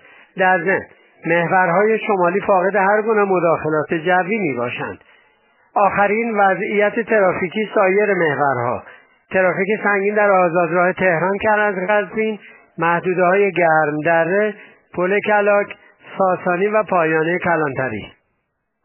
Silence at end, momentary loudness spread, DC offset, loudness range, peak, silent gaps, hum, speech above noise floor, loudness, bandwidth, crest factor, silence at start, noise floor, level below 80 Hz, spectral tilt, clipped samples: 0.75 s; 9 LU; under 0.1%; 2 LU; -2 dBFS; none; none; 54 dB; -17 LUFS; 3.2 kHz; 16 dB; 0.35 s; -71 dBFS; -58 dBFS; -10 dB/octave; under 0.1%